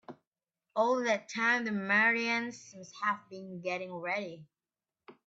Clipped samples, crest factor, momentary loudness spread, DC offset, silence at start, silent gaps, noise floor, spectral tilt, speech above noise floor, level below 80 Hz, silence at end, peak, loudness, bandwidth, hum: under 0.1%; 18 dB; 16 LU; under 0.1%; 0.1 s; 0.27-0.32 s; under -90 dBFS; -4 dB/octave; over 58 dB; -84 dBFS; 0.15 s; -16 dBFS; -31 LUFS; 8 kHz; none